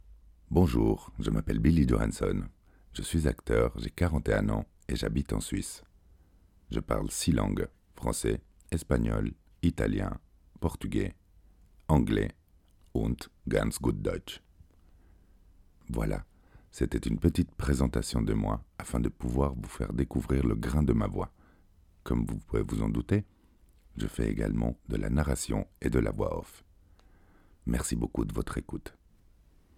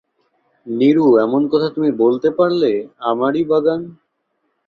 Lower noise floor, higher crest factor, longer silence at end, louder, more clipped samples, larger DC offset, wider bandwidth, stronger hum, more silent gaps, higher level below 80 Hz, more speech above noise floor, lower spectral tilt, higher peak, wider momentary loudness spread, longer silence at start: second, -61 dBFS vs -69 dBFS; first, 20 dB vs 14 dB; about the same, 0.85 s vs 0.75 s; second, -31 LUFS vs -16 LUFS; neither; neither; first, 16.5 kHz vs 6.2 kHz; neither; neither; first, -38 dBFS vs -60 dBFS; second, 32 dB vs 54 dB; second, -6.5 dB/octave vs -8.5 dB/octave; second, -12 dBFS vs -2 dBFS; about the same, 11 LU vs 9 LU; second, 0.1 s vs 0.65 s